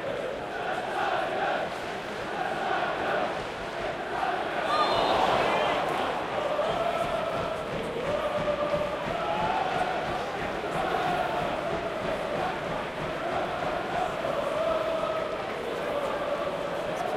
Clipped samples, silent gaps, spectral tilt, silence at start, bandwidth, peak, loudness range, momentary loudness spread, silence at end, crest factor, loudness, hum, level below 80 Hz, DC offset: under 0.1%; none; -4.5 dB/octave; 0 s; 16 kHz; -12 dBFS; 3 LU; 7 LU; 0 s; 16 dB; -29 LUFS; none; -52 dBFS; under 0.1%